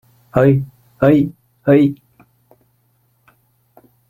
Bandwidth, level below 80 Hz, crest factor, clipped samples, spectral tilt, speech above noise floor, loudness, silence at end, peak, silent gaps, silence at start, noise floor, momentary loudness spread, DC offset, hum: 15 kHz; -52 dBFS; 16 dB; under 0.1%; -10 dB/octave; 48 dB; -15 LUFS; 2.15 s; -2 dBFS; none; 0.35 s; -61 dBFS; 11 LU; under 0.1%; none